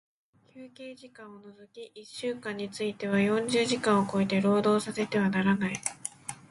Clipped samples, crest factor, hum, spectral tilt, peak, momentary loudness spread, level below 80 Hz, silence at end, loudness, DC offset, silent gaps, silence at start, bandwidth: under 0.1%; 20 dB; none; -5 dB/octave; -10 dBFS; 21 LU; -68 dBFS; 0.15 s; -28 LUFS; under 0.1%; none; 0.55 s; 11.5 kHz